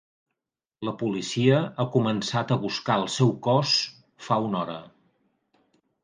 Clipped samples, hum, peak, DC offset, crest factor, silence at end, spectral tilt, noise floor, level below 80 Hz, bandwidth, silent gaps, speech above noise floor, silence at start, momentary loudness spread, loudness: under 0.1%; none; -8 dBFS; under 0.1%; 20 dB; 1.15 s; -5.5 dB/octave; -87 dBFS; -66 dBFS; 9.8 kHz; none; 62 dB; 0.8 s; 12 LU; -25 LUFS